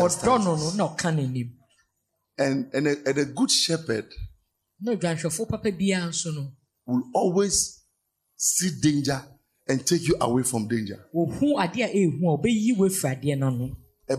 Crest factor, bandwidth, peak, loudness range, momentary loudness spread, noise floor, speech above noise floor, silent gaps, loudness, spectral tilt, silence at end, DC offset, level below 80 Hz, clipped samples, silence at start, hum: 16 dB; 14 kHz; -8 dBFS; 3 LU; 10 LU; -77 dBFS; 53 dB; none; -25 LUFS; -4.5 dB/octave; 0 s; under 0.1%; -52 dBFS; under 0.1%; 0 s; none